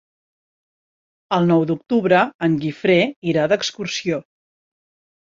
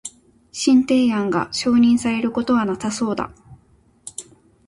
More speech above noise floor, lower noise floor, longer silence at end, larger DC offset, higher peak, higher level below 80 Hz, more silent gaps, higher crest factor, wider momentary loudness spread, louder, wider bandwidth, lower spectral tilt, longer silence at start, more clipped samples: first, over 72 dB vs 38 dB; first, under -90 dBFS vs -56 dBFS; first, 1 s vs 0.45 s; neither; about the same, -2 dBFS vs -4 dBFS; second, -62 dBFS vs -54 dBFS; first, 2.34-2.39 s, 3.16-3.22 s vs none; about the same, 18 dB vs 16 dB; second, 7 LU vs 20 LU; about the same, -19 LUFS vs -19 LUFS; second, 7.6 kHz vs 11.5 kHz; about the same, -5.5 dB/octave vs -4.5 dB/octave; first, 1.3 s vs 0.05 s; neither